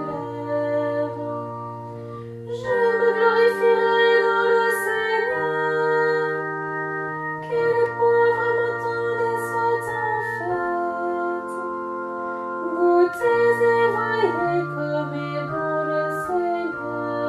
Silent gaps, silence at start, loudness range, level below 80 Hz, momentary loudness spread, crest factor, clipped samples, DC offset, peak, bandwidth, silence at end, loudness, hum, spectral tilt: none; 0 s; 5 LU; -62 dBFS; 11 LU; 16 dB; under 0.1%; under 0.1%; -6 dBFS; 13.5 kHz; 0 s; -22 LUFS; none; -6 dB/octave